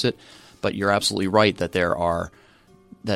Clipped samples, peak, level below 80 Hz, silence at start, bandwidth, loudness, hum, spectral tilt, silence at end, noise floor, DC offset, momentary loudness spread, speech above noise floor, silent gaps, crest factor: under 0.1%; -4 dBFS; -50 dBFS; 0 s; 16 kHz; -22 LUFS; none; -4.5 dB/octave; 0 s; -54 dBFS; under 0.1%; 15 LU; 32 dB; none; 20 dB